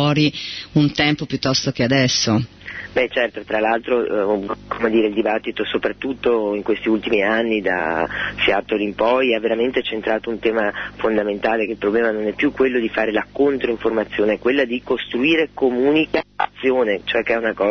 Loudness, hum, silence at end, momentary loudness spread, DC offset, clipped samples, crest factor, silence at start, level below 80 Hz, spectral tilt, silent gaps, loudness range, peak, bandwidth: -19 LUFS; 50 Hz at -50 dBFS; 0 s; 5 LU; under 0.1%; under 0.1%; 16 dB; 0 s; -50 dBFS; -5 dB/octave; none; 1 LU; -2 dBFS; 6.6 kHz